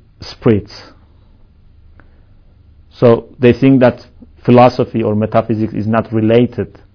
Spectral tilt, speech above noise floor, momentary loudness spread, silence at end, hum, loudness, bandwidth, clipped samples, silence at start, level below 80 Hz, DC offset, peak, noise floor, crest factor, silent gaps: -9 dB/octave; 33 dB; 11 LU; 0.3 s; none; -13 LUFS; 5.4 kHz; 0.3%; 0.2 s; -42 dBFS; under 0.1%; 0 dBFS; -44 dBFS; 14 dB; none